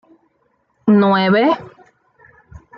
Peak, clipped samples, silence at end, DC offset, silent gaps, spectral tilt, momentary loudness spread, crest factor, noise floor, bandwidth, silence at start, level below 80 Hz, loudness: -2 dBFS; under 0.1%; 1.1 s; under 0.1%; none; -9 dB/octave; 10 LU; 16 dB; -63 dBFS; 5.6 kHz; 0.85 s; -54 dBFS; -15 LUFS